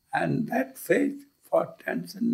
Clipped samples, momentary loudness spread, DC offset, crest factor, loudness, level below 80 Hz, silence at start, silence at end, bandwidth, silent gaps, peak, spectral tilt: under 0.1%; 8 LU; under 0.1%; 18 dB; -28 LUFS; -72 dBFS; 0.1 s; 0 s; 16 kHz; none; -10 dBFS; -6.5 dB/octave